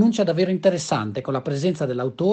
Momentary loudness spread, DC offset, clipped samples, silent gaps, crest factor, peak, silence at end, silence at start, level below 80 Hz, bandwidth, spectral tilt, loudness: 6 LU; under 0.1%; under 0.1%; none; 16 dB; -6 dBFS; 0 s; 0 s; -62 dBFS; 9 kHz; -6 dB/octave; -22 LUFS